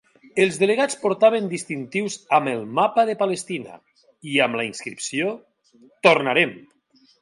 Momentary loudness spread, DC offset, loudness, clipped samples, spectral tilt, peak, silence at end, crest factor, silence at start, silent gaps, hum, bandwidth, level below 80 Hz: 11 LU; under 0.1%; -21 LUFS; under 0.1%; -4 dB/octave; 0 dBFS; 0.65 s; 22 dB; 0.35 s; none; none; 11.5 kHz; -72 dBFS